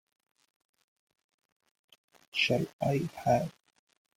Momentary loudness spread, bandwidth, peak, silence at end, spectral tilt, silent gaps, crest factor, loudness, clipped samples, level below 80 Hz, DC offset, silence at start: 6 LU; 16.5 kHz; -14 dBFS; 0.65 s; -5.5 dB/octave; 2.73-2.79 s; 22 dB; -30 LUFS; under 0.1%; -64 dBFS; under 0.1%; 2.35 s